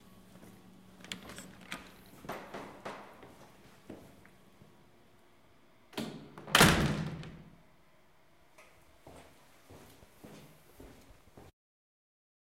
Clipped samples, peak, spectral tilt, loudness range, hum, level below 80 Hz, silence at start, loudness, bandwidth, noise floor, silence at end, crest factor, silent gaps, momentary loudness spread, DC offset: under 0.1%; -6 dBFS; -3.5 dB/octave; 20 LU; none; -54 dBFS; 0.35 s; -32 LUFS; 16 kHz; -66 dBFS; 1.1 s; 34 dB; none; 30 LU; under 0.1%